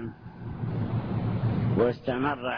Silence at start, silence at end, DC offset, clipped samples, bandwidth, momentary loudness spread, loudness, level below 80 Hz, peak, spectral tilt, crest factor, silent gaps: 0 s; 0 s; under 0.1%; under 0.1%; 5.4 kHz; 14 LU; -28 LUFS; -48 dBFS; -12 dBFS; -10.5 dB/octave; 16 dB; none